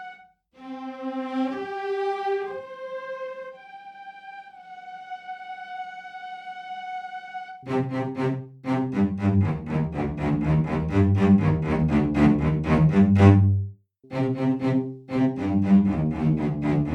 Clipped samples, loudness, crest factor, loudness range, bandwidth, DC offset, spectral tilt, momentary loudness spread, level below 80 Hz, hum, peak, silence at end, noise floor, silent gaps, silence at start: under 0.1%; -23 LUFS; 24 dB; 18 LU; 7.8 kHz; under 0.1%; -9.5 dB/octave; 20 LU; -44 dBFS; none; 0 dBFS; 0 s; -51 dBFS; none; 0 s